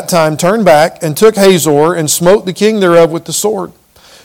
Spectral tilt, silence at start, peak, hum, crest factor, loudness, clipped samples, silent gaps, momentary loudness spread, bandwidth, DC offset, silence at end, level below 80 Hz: -4.5 dB/octave; 0 s; 0 dBFS; none; 10 dB; -9 LUFS; 4%; none; 7 LU; 18.5 kHz; 0.8%; 0.55 s; -46 dBFS